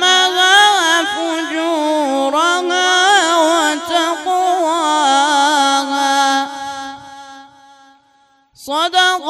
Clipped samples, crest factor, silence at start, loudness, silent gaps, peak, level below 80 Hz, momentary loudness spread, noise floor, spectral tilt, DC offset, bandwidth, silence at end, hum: under 0.1%; 14 dB; 0 s; -13 LUFS; none; 0 dBFS; -66 dBFS; 9 LU; -54 dBFS; 0.5 dB/octave; under 0.1%; 15.5 kHz; 0 s; none